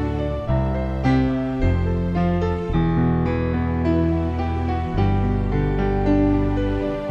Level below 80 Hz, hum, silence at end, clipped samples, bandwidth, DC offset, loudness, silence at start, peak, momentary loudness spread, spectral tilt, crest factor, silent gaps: -28 dBFS; none; 0 s; under 0.1%; 7 kHz; under 0.1%; -21 LUFS; 0 s; -8 dBFS; 4 LU; -9.5 dB/octave; 12 dB; none